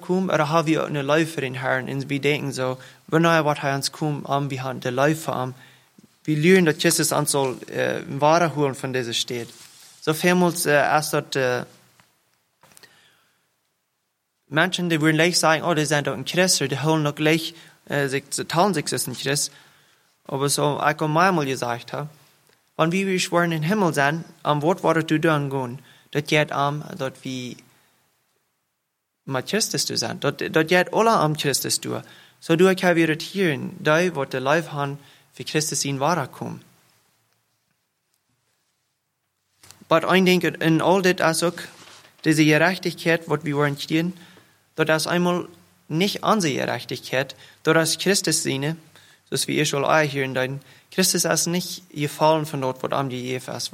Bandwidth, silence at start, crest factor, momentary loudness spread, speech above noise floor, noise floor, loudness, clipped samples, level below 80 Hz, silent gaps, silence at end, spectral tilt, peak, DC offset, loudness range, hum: 16.5 kHz; 0 s; 20 dB; 11 LU; 55 dB; -77 dBFS; -22 LUFS; under 0.1%; -68 dBFS; none; 0.05 s; -4 dB/octave; -2 dBFS; under 0.1%; 7 LU; none